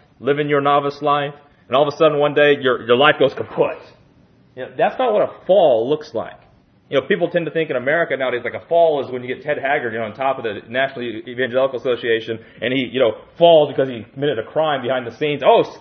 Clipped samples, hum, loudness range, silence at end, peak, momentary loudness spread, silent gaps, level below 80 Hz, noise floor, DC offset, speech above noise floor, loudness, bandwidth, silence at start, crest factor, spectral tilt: under 0.1%; none; 4 LU; 0 s; 0 dBFS; 11 LU; none; -64 dBFS; -52 dBFS; under 0.1%; 34 dB; -18 LUFS; 6.4 kHz; 0.2 s; 18 dB; -6.5 dB/octave